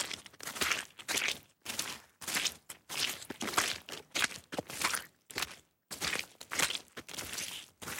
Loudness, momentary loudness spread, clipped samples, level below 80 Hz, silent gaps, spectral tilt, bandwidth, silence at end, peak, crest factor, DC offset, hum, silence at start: -36 LUFS; 10 LU; under 0.1%; -68 dBFS; none; -0.5 dB/octave; 17 kHz; 0 s; -12 dBFS; 26 dB; under 0.1%; none; 0 s